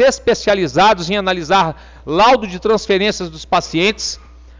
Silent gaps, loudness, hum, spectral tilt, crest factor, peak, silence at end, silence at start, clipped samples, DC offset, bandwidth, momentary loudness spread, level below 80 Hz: none; -15 LUFS; none; -4 dB/octave; 10 dB; -6 dBFS; 0.4 s; 0 s; under 0.1%; under 0.1%; 7.6 kHz; 10 LU; -40 dBFS